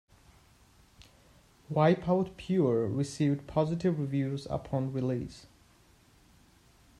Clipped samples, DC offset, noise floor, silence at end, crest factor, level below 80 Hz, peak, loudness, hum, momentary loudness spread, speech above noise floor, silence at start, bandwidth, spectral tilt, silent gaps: under 0.1%; under 0.1%; -62 dBFS; 1.55 s; 20 dB; -60 dBFS; -12 dBFS; -30 LUFS; none; 9 LU; 32 dB; 1.7 s; 12 kHz; -7.5 dB/octave; none